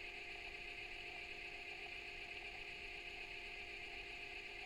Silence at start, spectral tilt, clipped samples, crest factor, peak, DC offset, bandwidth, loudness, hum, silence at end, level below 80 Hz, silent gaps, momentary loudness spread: 0 s; -2.5 dB/octave; under 0.1%; 14 dB; -38 dBFS; under 0.1%; 16 kHz; -49 LUFS; none; 0 s; -64 dBFS; none; 0 LU